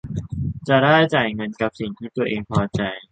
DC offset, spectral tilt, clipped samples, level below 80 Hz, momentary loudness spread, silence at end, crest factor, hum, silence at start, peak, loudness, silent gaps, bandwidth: under 0.1%; -7 dB/octave; under 0.1%; -44 dBFS; 13 LU; 0.1 s; 18 dB; none; 0.05 s; -2 dBFS; -21 LUFS; none; 9 kHz